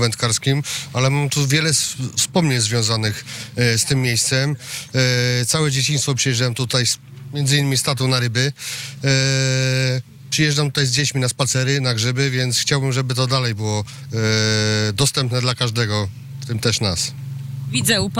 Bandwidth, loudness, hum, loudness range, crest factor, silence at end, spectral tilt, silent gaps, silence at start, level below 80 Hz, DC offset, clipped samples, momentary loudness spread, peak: 16 kHz; -18 LUFS; none; 1 LU; 12 dB; 0 s; -3.5 dB/octave; none; 0 s; -52 dBFS; under 0.1%; under 0.1%; 7 LU; -8 dBFS